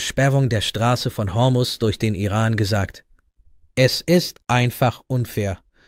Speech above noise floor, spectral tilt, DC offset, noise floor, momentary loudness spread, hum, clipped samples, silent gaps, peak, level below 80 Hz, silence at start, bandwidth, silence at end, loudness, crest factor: 34 dB; -5.5 dB/octave; under 0.1%; -53 dBFS; 7 LU; none; under 0.1%; none; -2 dBFS; -46 dBFS; 0 s; 16 kHz; 0.3 s; -20 LUFS; 18 dB